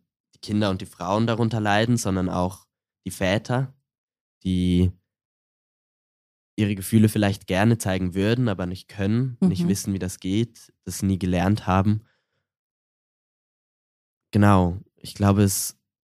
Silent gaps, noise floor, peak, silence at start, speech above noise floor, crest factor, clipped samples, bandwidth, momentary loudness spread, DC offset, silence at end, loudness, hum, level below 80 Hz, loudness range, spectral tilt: 3.98-4.08 s, 4.21-4.41 s, 5.25-6.57 s, 12.59-14.21 s; under -90 dBFS; -2 dBFS; 0.45 s; over 68 dB; 22 dB; under 0.1%; 15.5 kHz; 11 LU; under 0.1%; 0.4 s; -23 LUFS; none; -50 dBFS; 4 LU; -6 dB/octave